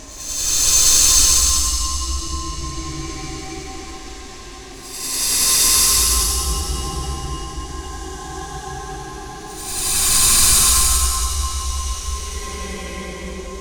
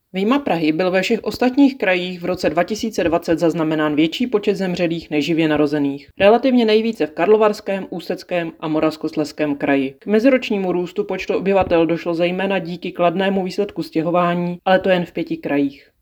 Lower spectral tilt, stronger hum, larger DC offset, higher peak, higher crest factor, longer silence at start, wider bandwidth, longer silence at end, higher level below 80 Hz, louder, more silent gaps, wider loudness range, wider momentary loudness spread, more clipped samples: second, -1 dB/octave vs -6 dB/octave; neither; neither; about the same, 0 dBFS vs 0 dBFS; about the same, 20 dB vs 18 dB; second, 0 s vs 0.15 s; first, over 20 kHz vs 17.5 kHz; second, 0 s vs 0.25 s; first, -28 dBFS vs -52 dBFS; first, -15 LUFS vs -18 LUFS; neither; first, 11 LU vs 3 LU; first, 21 LU vs 8 LU; neither